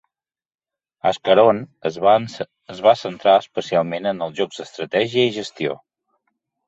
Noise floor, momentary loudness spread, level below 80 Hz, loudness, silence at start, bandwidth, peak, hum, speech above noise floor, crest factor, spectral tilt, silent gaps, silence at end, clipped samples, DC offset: under -90 dBFS; 12 LU; -62 dBFS; -19 LUFS; 1.05 s; 8 kHz; -2 dBFS; none; over 71 dB; 18 dB; -5 dB/octave; none; 0.9 s; under 0.1%; under 0.1%